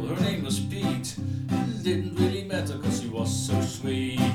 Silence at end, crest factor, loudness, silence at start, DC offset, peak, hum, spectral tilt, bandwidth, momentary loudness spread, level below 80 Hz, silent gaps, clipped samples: 0 s; 16 dB; -28 LUFS; 0 s; under 0.1%; -10 dBFS; none; -5.5 dB/octave; 17 kHz; 4 LU; -54 dBFS; none; under 0.1%